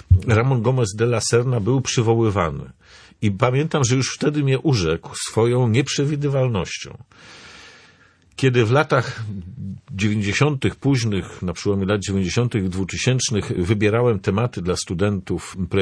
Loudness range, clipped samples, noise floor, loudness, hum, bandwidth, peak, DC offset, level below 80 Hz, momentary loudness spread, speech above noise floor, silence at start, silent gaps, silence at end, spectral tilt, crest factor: 3 LU; under 0.1%; -53 dBFS; -20 LUFS; none; 11 kHz; -2 dBFS; under 0.1%; -42 dBFS; 11 LU; 34 dB; 0.1 s; none; 0 s; -5.5 dB/octave; 18 dB